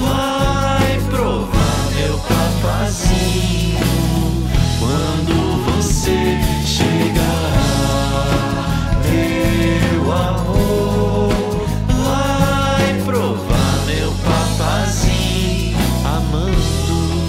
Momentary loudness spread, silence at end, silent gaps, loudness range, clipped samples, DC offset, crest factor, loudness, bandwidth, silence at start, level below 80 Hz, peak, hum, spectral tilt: 2 LU; 0 s; none; 1 LU; under 0.1%; under 0.1%; 12 dB; -17 LUFS; 16.5 kHz; 0 s; -22 dBFS; -2 dBFS; none; -5.5 dB/octave